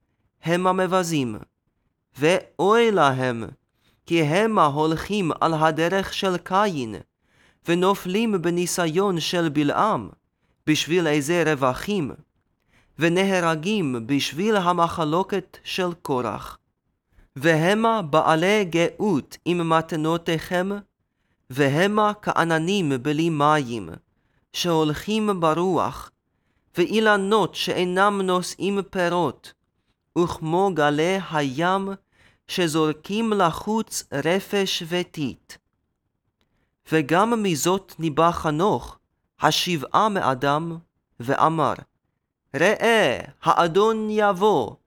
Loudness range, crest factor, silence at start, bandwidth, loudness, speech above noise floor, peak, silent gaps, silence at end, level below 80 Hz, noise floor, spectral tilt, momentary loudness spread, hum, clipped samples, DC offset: 3 LU; 20 dB; 0.45 s; 18 kHz; -22 LUFS; 55 dB; -2 dBFS; none; 0.1 s; -56 dBFS; -76 dBFS; -5 dB/octave; 10 LU; none; under 0.1%; under 0.1%